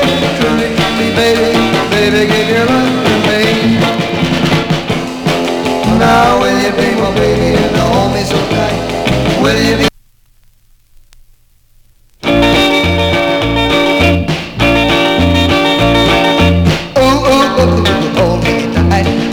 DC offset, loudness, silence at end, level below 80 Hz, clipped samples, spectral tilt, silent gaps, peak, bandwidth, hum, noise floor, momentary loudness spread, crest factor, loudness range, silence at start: 0.2%; -11 LUFS; 0 s; -28 dBFS; under 0.1%; -5.5 dB/octave; none; 0 dBFS; 19 kHz; none; -47 dBFS; 5 LU; 10 dB; 5 LU; 0 s